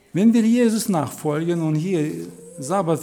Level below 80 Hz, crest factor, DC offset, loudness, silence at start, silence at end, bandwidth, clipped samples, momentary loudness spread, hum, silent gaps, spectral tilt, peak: -68 dBFS; 14 dB; under 0.1%; -20 LUFS; 0.15 s; 0 s; 17.5 kHz; under 0.1%; 13 LU; none; none; -6.5 dB/octave; -6 dBFS